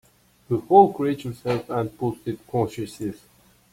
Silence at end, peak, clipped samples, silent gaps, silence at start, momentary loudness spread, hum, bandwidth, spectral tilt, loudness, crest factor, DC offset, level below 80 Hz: 0.55 s; -2 dBFS; under 0.1%; none; 0.5 s; 16 LU; none; 16 kHz; -7.5 dB/octave; -23 LUFS; 22 dB; under 0.1%; -58 dBFS